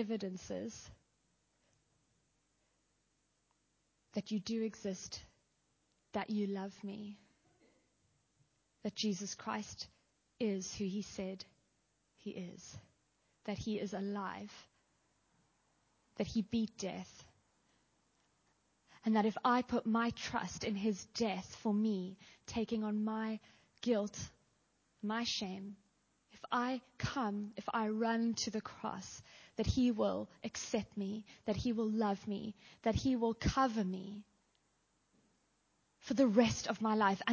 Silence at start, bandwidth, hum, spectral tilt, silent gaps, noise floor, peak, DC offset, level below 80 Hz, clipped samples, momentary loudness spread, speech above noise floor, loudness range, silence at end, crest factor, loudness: 0 s; 7.2 kHz; none; -5 dB/octave; none; -79 dBFS; -16 dBFS; under 0.1%; -60 dBFS; under 0.1%; 16 LU; 42 dB; 9 LU; 0 s; 24 dB; -38 LUFS